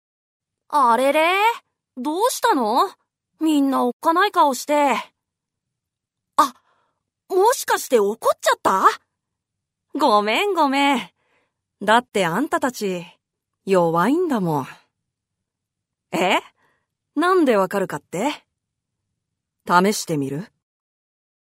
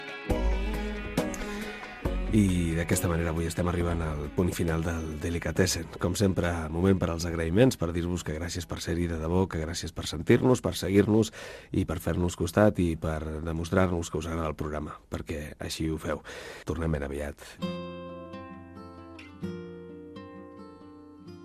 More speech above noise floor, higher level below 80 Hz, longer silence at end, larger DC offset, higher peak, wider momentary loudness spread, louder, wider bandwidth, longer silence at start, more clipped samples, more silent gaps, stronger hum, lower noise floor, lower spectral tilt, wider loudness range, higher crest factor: first, 64 dB vs 21 dB; second, -72 dBFS vs -40 dBFS; first, 1.05 s vs 0 s; neither; first, 0 dBFS vs -8 dBFS; second, 10 LU vs 19 LU; first, -20 LUFS vs -29 LUFS; first, 16 kHz vs 14.5 kHz; first, 0.7 s vs 0 s; neither; first, 3.93-4.00 s vs none; neither; first, -83 dBFS vs -49 dBFS; second, -4 dB/octave vs -6 dB/octave; second, 4 LU vs 10 LU; about the same, 20 dB vs 20 dB